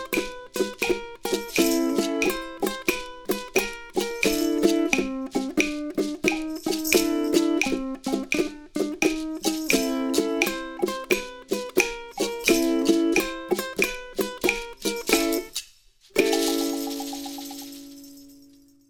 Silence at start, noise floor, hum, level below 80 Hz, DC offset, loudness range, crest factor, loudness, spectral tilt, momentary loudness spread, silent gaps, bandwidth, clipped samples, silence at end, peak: 0 s; -55 dBFS; none; -50 dBFS; under 0.1%; 2 LU; 22 dB; -25 LUFS; -3 dB/octave; 9 LU; none; 18 kHz; under 0.1%; 0.5 s; -4 dBFS